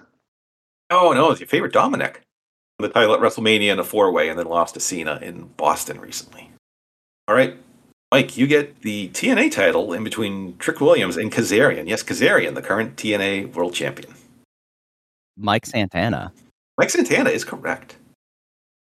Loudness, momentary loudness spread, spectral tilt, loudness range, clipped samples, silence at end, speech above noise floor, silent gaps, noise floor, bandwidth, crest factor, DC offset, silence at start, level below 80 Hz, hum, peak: -19 LUFS; 11 LU; -4 dB/octave; 6 LU; under 0.1%; 1.05 s; over 71 dB; 2.32-2.79 s, 6.59-7.27 s, 7.93-8.12 s, 14.45-15.34 s, 16.51-16.78 s; under -90 dBFS; 14.5 kHz; 20 dB; under 0.1%; 0.9 s; -60 dBFS; none; -2 dBFS